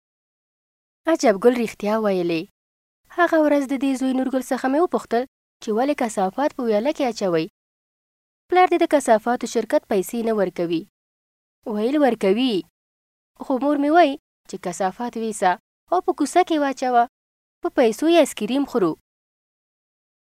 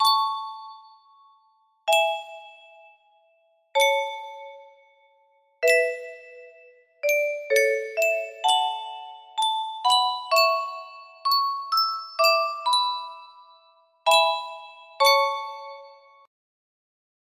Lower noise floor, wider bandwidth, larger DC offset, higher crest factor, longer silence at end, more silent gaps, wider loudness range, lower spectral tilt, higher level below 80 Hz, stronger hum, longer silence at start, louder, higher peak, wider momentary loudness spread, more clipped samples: first, under -90 dBFS vs -64 dBFS; about the same, 16 kHz vs 16 kHz; neither; about the same, 18 dB vs 20 dB; about the same, 1.3 s vs 1.35 s; first, 2.51-3.04 s, 5.28-5.60 s, 7.50-8.49 s, 10.89-11.62 s, 12.70-13.35 s, 14.19-14.44 s, 15.60-15.87 s, 17.09-17.61 s vs none; second, 3 LU vs 6 LU; first, -5 dB/octave vs 3 dB/octave; first, -64 dBFS vs -80 dBFS; neither; first, 1.05 s vs 0 s; about the same, -21 LUFS vs -23 LUFS; first, -2 dBFS vs -6 dBFS; second, 11 LU vs 21 LU; neither